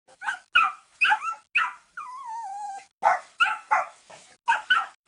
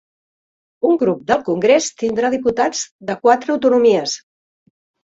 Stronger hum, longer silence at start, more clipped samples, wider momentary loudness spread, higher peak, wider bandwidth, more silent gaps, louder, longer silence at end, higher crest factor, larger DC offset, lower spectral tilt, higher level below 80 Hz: neither; second, 0.2 s vs 0.85 s; neither; first, 15 LU vs 9 LU; second, -8 dBFS vs -2 dBFS; first, 10.5 kHz vs 8 kHz; about the same, 2.93-3.01 s vs 2.91-2.99 s; second, -25 LUFS vs -17 LUFS; second, 0.15 s vs 0.85 s; about the same, 20 dB vs 16 dB; neither; second, 1 dB/octave vs -4 dB/octave; second, -72 dBFS vs -58 dBFS